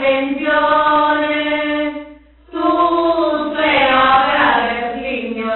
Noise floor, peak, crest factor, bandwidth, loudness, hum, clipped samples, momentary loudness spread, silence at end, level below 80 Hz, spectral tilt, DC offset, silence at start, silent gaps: -41 dBFS; 0 dBFS; 16 dB; 4.3 kHz; -15 LUFS; none; under 0.1%; 10 LU; 0 s; -46 dBFS; -0.5 dB/octave; under 0.1%; 0 s; none